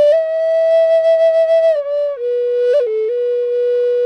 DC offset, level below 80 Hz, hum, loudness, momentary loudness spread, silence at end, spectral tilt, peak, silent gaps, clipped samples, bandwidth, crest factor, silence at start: under 0.1%; -64 dBFS; none; -14 LUFS; 6 LU; 0 s; -2 dB/octave; -6 dBFS; none; under 0.1%; 6.2 kHz; 8 dB; 0 s